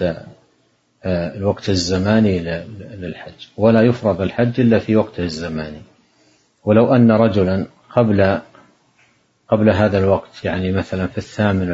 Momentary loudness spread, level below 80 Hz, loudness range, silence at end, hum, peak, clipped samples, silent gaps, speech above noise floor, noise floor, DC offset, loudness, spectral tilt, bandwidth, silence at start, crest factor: 16 LU; -46 dBFS; 3 LU; 0 s; none; 0 dBFS; under 0.1%; none; 44 dB; -61 dBFS; under 0.1%; -17 LUFS; -7 dB/octave; 8 kHz; 0 s; 16 dB